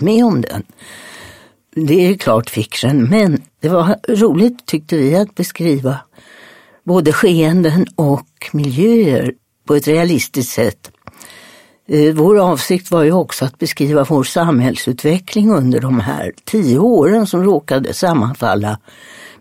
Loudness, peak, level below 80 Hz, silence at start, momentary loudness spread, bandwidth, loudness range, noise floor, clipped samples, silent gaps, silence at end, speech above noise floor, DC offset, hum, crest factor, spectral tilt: -14 LUFS; 0 dBFS; -52 dBFS; 0 s; 10 LU; 16.5 kHz; 2 LU; -43 dBFS; under 0.1%; none; 0.15 s; 29 dB; under 0.1%; none; 14 dB; -6.5 dB/octave